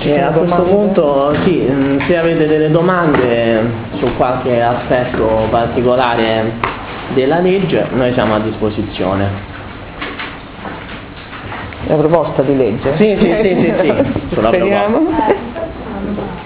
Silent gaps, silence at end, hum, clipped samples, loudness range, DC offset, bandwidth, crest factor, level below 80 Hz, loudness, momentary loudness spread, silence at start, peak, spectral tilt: none; 0 s; none; under 0.1%; 7 LU; under 0.1%; 4 kHz; 14 dB; -34 dBFS; -14 LUFS; 13 LU; 0 s; 0 dBFS; -11 dB/octave